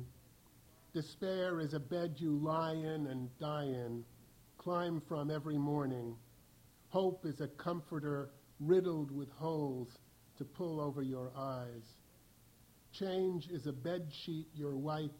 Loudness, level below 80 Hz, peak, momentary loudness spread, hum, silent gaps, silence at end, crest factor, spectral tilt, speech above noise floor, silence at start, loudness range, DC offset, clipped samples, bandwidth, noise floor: -40 LUFS; -72 dBFS; -20 dBFS; 11 LU; none; none; 0 s; 20 dB; -7.5 dB/octave; 26 dB; 0 s; 4 LU; under 0.1%; under 0.1%; 17 kHz; -65 dBFS